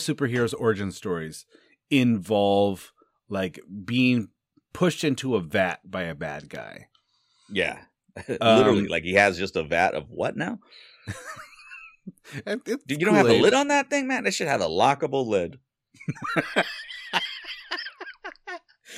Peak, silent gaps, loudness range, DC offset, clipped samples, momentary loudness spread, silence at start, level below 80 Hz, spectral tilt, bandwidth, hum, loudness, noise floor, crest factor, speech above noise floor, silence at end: -4 dBFS; none; 8 LU; under 0.1%; under 0.1%; 20 LU; 0 s; -60 dBFS; -5 dB/octave; 15.5 kHz; none; -24 LUFS; -67 dBFS; 22 dB; 42 dB; 0 s